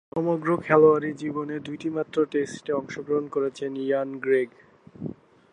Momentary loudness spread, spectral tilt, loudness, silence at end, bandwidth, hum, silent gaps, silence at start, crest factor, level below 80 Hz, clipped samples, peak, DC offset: 14 LU; -7 dB/octave; -25 LUFS; 0.4 s; 9.8 kHz; none; none; 0.15 s; 22 dB; -66 dBFS; under 0.1%; -4 dBFS; under 0.1%